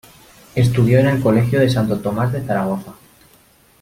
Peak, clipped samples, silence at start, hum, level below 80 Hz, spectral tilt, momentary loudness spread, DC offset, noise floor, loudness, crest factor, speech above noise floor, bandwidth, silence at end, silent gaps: -2 dBFS; under 0.1%; 0.55 s; none; -46 dBFS; -7.5 dB/octave; 8 LU; under 0.1%; -52 dBFS; -17 LUFS; 16 dB; 36 dB; 16 kHz; 0.9 s; none